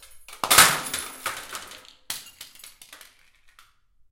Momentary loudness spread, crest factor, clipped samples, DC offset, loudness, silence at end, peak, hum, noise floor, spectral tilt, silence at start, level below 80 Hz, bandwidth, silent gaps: 28 LU; 26 dB; under 0.1%; under 0.1%; -19 LUFS; 1.15 s; 0 dBFS; none; -58 dBFS; 0.5 dB/octave; 0.15 s; -56 dBFS; 17 kHz; none